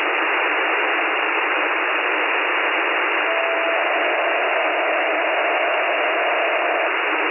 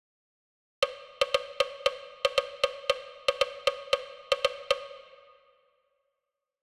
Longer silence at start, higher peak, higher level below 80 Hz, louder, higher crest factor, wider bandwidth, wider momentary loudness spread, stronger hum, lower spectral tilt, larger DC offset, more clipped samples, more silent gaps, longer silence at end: second, 0 s vs 0.8 s; about the same, -8 dBFS vs -10 dBFS; second, under -90 dBFS vs -64 dBFS; first, -18 LUFS vs -30 LUFS; second, 12 dB vs 22 dB; second, 3.1 kHz vs 14.5 kHz; about the same, 1 LU vs 3 LU; neither; first, -2.5 dB/octave vs 0 dB/octave; neither; neither; neither; second, 0 s vs 1.6 s